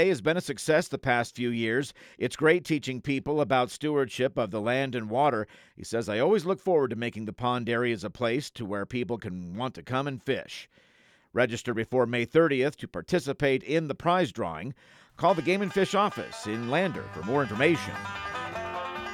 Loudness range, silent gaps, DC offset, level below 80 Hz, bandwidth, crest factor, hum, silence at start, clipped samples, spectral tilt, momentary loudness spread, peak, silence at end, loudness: 4 LU; none; under 0.1%; -62 dBFS; 15.5 kHz; 18 dB; none; 0 s; under 0.1%; -5.5 dB/octave; 10 LU; -10 dBFS; 0 s; -28 LUFS